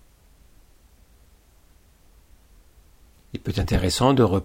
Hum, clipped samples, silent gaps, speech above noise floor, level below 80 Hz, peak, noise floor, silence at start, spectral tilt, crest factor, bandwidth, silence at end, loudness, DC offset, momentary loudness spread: none; under 0.1%; none; 35 dB; -38 dBFS; -6 dBFS; -55 dBFS; 3.35 s; -6 dB/octave; 20 dB; 16 kHz; 0 s; -22 LUFS; under 0.1%; 16 LU